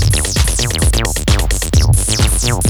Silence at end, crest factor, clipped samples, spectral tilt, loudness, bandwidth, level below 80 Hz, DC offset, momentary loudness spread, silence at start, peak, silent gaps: 0 s; 12 dB; under 0.1%; -3.5 dB/octave; -14 LUFS; over 20 kHz; -16 dBFS; under 0.1%; 2 LU; 0 s; 0 dBFS; none